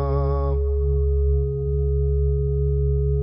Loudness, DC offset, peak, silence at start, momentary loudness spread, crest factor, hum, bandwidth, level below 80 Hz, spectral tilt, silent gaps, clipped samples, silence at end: -23 LUFS; under 0.1%; -12 dBFS; 0 s; 2 LU; 10 dB; none; 1.8 kHz; -22 dBFS; -13 dB/octave; none; under 0.1%; 0 s